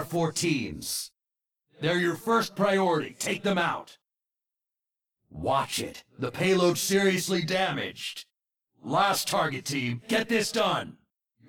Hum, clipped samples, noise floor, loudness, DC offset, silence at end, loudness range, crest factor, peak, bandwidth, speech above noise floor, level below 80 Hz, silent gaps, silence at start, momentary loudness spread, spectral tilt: none; under 0.1%; -90 dBFS; -27 LUFS; under 0.1%; 0.55 s; 3 LU; 16 dB; -12 dBFS; 18.5 kHz; 63 dB; -62 dBFS; none; 0 s; 12 LU; -4 dB/octave